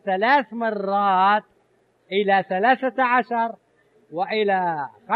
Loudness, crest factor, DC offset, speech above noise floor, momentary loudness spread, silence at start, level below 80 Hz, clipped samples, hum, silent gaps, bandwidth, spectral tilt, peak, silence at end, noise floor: -21 LUFS; 18 dB; under 0.1%; 42 dB; 8 LU; 0.05 s; -76 dBFS; under 0.1%; none; none; 5.8 kHz; -7.5 dB/octave; -4 dBFS; 0 s; -63 dBFS